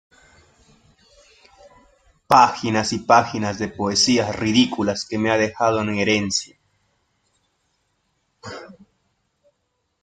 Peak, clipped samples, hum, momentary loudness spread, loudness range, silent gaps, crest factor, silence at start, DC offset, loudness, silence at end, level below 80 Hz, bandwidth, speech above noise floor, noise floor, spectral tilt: 0 dBFS; under 0.1%; none; 21 LU; 7 LU; none; 22 dB; 2.3 s; under 0.1%; -19 LUFS; 1.3 s; -58 dBFS; 13.5 kHz; 53 dB; -72 dBFS; -3.5 dB/octave